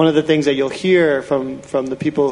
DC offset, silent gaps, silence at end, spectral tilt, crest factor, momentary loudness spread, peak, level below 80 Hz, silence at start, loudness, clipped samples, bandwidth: under 0.1%; none; 0 s; -6 dB/octave; 14 dB; 8 LU; -2 dBFS; -54 dBFS; 0 s; -17 LUFS; under 0.1%; 11 kHz